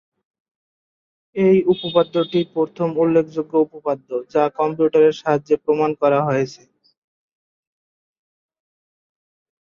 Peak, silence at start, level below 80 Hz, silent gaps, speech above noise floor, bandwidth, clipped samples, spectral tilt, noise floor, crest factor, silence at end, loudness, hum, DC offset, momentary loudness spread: -4 dBFS; 1.35 s; -64 dBFS; none; over 72 dB; 7 kHz; under 0.1%; -7.5 dB/octave; under -90 dBFS; 18 dB; 3.1 s; -19 LUFS; none; under 0.1%; 7 LU